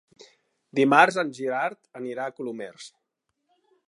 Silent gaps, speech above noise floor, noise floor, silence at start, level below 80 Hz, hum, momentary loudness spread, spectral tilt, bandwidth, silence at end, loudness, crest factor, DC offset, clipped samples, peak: none; 55 dB; -80 dBFS; 0.75 s; -82 dBFS; none; 21 LU; -5 dB/octave; 11.5 kHz; 1 s; -24 LUFS; 24 dB; under 0.1%; under 0.1%; -2 dBFS